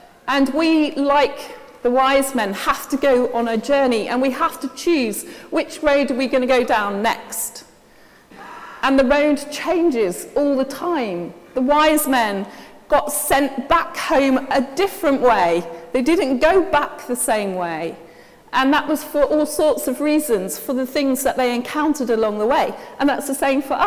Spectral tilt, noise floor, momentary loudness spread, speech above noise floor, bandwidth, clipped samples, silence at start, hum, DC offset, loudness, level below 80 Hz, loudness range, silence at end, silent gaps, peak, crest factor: -3.5 dB/octave; -49 dBFS; 9 LU; 30 dB; 16 kHz; under 0.1%; 0.25 s; none; under 0.1%; -19 LUFS; -48 dBFS; 2 LU; 0 s; none; -2 dBFS; 18 dB